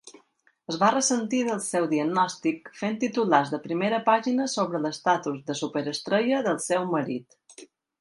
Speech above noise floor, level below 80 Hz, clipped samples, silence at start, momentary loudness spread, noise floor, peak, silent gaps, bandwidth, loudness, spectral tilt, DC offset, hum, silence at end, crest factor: 38 dB; -74 dBFS; under 0.1%; 0.05 s; 8 LU; -64 dBFS; -4 dBFS; none; 11.5 kHz; -26 LUFS; -4 dB/octave; under 0.1%; none; 0.35 s; 22 dB